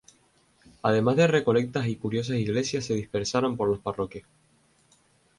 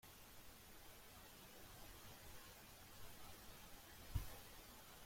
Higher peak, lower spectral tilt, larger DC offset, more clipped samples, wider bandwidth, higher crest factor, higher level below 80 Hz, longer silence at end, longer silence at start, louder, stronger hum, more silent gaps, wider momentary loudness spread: first, -8 dBFS vs -32 dBFS; first, -6 dB/octave vs -3.5 dB/octave; neither; neither; second, 11.5 kHz vs 16.5 kHz; second, 20 dB vs 26 dB; about the same, -58 dBFS vs -62 dBFS; first, 1.2 s vs 0 s; first, 0.85 s vs 0.05 s; first, -26 LUFS vs -58 LUFS; neither; neither; about the same, 10 LU vs 10 LU